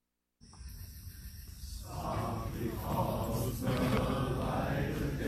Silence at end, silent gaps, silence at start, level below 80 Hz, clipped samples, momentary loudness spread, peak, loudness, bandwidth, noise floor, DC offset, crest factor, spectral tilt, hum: 0 s; none; 0.45 s; -44 dBFS; under 0.1%; 17 LU; -18 dBFS; -35 LUFS; 15 kHz; -63 dBFS; under 0.1%; 18 dB; -6.5 dB/octave; none